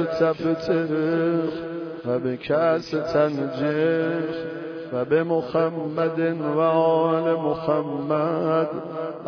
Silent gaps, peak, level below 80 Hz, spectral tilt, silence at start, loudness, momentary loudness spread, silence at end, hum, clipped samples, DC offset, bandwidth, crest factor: none; -8 dBFS; -62 dBFS; -8 dB/octave; 0 s; -23 LUFS; 9 LU; 0 s; none; under 0.1%; under 0.1%; 5.4 kHz; 14 dB